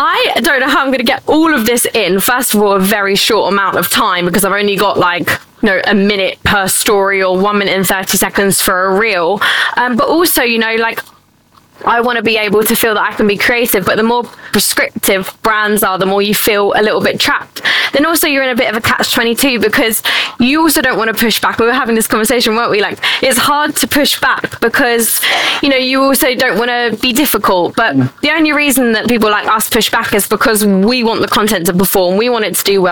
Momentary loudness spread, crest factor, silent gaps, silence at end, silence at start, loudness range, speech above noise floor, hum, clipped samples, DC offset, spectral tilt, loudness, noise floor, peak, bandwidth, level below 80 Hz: 3 LU; 10 dB; none; 0 s; 0 s; 1 LU; 36 dB; none; under 0.1%; 0.4%; -3 dB/octave; -11 LUFS; -48 dBFS; -2 dBFS; 19.5 kHz; -42 dBFS